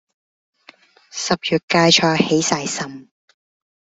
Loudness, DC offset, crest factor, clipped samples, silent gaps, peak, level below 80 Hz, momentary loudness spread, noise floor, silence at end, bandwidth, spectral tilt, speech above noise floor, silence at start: -17 LUFS; under 0.1%; 20 dB; under 0.1%; 1.63-1.68 s; 0 dBFS; -58 dBFS; 14 LU; -50 dBFS; 0.95 s; 8.4 kHz; -3.5 dB/octave; 32 dB; 1.15 s